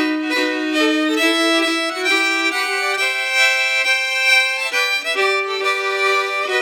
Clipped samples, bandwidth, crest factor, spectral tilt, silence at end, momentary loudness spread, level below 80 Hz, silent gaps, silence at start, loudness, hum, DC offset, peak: under 0.1%; 20 kHz; 16 dB; 1 dB/octave; 0 s; 5 LU; under -90 dBFS; none; 0 s; -16 LUFS; none; under 0.1%; -2 dBFS